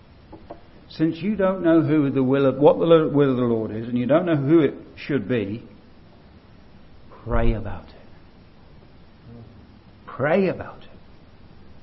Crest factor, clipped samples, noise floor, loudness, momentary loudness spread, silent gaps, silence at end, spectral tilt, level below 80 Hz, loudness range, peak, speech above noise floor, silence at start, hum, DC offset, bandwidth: 20 dB; under 0.1%; -48 dBFS; -21 LUFS; 20 LU; none; 0.05 s; -11 dB/octave; -38 dBFS; 13 LU; -2 dBFS; 28 dB; 0.3 s; none; under 0.1%; 5.8 kHz